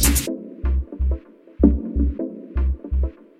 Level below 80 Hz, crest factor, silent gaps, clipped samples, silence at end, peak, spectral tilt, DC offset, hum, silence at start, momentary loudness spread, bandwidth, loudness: -24 dBFS; 20 dB; none; under 0.1%; 0.3 s; 0 dBFS; -5 dB/octave; under 0.1%; none; 0 s; 10 LU; 16.5 kHz; -23 LUFS